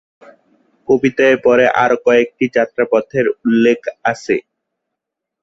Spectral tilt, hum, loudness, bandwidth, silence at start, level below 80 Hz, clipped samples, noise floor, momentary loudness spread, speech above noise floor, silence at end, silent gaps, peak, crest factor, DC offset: -5.5 dB/octave; none; -14 LUFS; 7.8 kHz; 0.9 s; -56 dBFS; under 0.1%; -80 dBFS; 8 LU; 66 dB; 1 s; none; -2 dBFS; 14 dB; under 0.1%